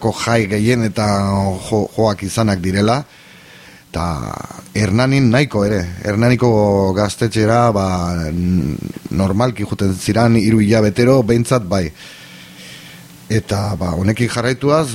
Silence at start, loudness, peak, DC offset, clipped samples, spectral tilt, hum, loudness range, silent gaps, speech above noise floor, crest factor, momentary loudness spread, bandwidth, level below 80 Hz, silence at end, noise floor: 0 s; -16 LUFS; 0 dBFS; under 0.1%; under 0.1%; -6.5 dB/octave; none; 4 LU; none; 26 dB; 14 dB; 14 LU; 16 kHz; -38 dBFS; 0 s; -41 dBFS